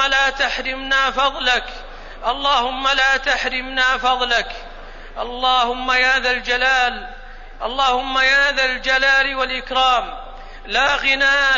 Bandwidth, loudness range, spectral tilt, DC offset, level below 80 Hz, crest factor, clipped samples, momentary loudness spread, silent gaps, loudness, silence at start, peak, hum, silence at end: 7.4 kHz; 2 LU; -1 dB/octave; under 0.1%; -36 dBFS; 14 dB; under 0.1%; 17 LU; none; -17 LUFS; 0 s; -4 dBFS; none; 0 s